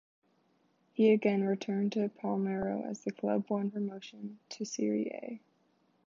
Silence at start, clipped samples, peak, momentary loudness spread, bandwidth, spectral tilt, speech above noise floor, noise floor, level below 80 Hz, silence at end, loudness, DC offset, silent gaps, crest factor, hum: 1 s; under 0.1%; -14 dBFS; 17 LU; 7.6 kHz; -6.5 dB/octave; 40 dB; -72 dBFS; -72 dBFS; 0.7 s; -33 LUFS; under 0.1%; none; 20 dB; none